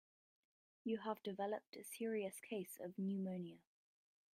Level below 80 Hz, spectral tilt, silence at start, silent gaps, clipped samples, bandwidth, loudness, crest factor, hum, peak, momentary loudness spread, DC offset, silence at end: under -90 dBFS; -6 dB/octave; 0.85 s; 1.67-1.73 s; under 0.1%; 16 kHz; -46 LUFS; 18 dB; none; -28 dBFS; 7 LU; under 0.1%; 0.75 s